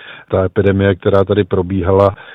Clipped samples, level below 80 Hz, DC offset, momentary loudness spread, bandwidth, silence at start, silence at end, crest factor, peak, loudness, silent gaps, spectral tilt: under 0.1%; -40 dBFS; under 0.1%; 4 LU; 4.6 kHz; 0 s; 0 s; 14 dB; 0 dBFS; -14 LUFS; none; -9.5 dB/octave